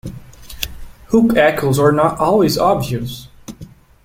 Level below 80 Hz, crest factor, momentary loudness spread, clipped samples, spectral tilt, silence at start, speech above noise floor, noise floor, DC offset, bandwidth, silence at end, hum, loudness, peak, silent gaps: -40 dBFS; 16 dB; 20 LU; under 0.1%; -6 dB/octave; 0.05 s; 25 dB; -39 dBFS; under 0.1%; 16.5 kHz; 0.4 s; none; -15 LUFS; 0 dBFS; none